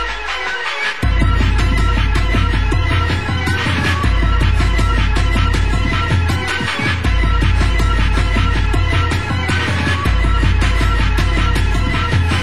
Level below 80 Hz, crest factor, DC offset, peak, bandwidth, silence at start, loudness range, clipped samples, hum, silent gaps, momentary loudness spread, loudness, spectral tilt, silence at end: -16 dBFS; 12 dB; 3%; -2 dBFS; 12.5 kHz; 0 s; 0 LU; under 0.1%; none; none; 2 LU; -16 LUFS; -5.5 dB/octave; 0 s